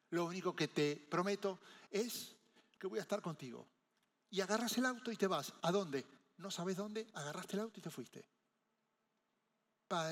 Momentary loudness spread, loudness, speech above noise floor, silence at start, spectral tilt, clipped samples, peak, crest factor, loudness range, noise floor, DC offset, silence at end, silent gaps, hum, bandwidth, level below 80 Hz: 15 LU; -41 LUFS; 44 dB; 0.1 s; -4.5 dB/octave; under 0.1%; -22 dBFS; 20 dB; 7 LU; -85 dBFS; under 0.1%; 0 s; none; none; 16.5 kHz; under -90 dBFS